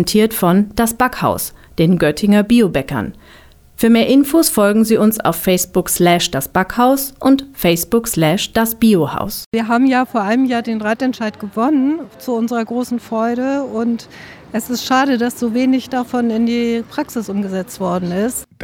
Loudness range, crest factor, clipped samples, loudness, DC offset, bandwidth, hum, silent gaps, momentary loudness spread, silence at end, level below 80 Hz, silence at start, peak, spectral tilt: 5 LU; 14 dB; under 0.1%; -16 LUFS; under 0.1%; over 20 kHz; none; 9.46-9.52 s; 9 LU; 0 s; -44 dBFS; 0 s; -2 dBFS; -5 dB/octave